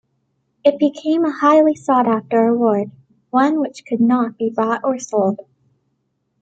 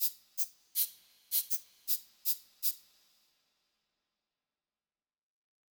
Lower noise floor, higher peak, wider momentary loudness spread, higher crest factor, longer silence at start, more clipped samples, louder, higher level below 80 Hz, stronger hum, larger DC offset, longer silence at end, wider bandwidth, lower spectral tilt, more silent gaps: second, -69 dBFS vs under -90 dBFS; first, -2 dBFS vs -16 dBFS; first, 8 LU vs 4 LU; second, 16 dB vs 24 dB; first, 0.65 s vs 0 s; neither; first, -17 LUFS vs -33 LUFS; first, -66 dBFS vs -88 dBFS; neither; neither; second, 1 s vs 2.95 s; second, 8.2 kHz vs over 20 kHz; first, -6 dB/octave vs 4.5 dB/octave; neither